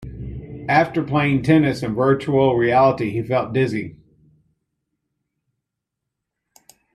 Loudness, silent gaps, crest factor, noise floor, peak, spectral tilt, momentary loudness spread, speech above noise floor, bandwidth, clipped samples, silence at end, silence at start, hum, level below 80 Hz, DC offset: -18 LUFS; none; 18 dB; -81 dBFS; -4 dBFS; -8 dB/octave; 16 LU; 64 dB; 12.5 kHz; under 0.1%; 3.05 s; 0 s; none; -48 dBFS; under 0.1%